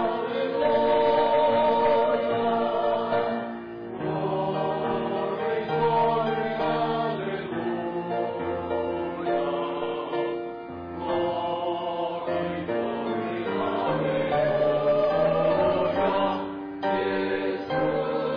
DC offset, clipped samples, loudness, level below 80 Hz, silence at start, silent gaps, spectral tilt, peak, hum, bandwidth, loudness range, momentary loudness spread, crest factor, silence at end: under 0.1%; under 0.1%; -26 LUFS; -58 dBFS; 0 s; none; -8.5 dB/octave; -14 dBFS; none; 5.2 kHz; 6 LU; 9 LU; 12 dB; 0 s